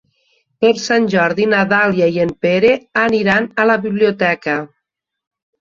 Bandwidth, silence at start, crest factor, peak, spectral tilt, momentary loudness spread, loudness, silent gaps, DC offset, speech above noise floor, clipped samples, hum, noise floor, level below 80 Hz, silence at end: 7.4 kHz; 0.6 s; 14 dB; -2 dBFS; -5.5 dB/octave; 4 LU; -15 LUFS; none; under 0.1%; 63 dB; under 0.1%; none; -77 dBFS; -54 dBFS; 0.95 s